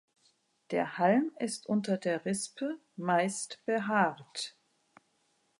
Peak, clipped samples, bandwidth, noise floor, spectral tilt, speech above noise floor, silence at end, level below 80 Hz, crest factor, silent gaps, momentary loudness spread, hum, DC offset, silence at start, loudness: -14 dBFS; under 0.1%; 11.5 kHz; -74 dBFS; -4.5 dB/octave; 43 dB; 1.1 s; -80 dBFS; 20 dB; none; 11 LU; none; under 0.1%; 0.7 s; -32 LUFS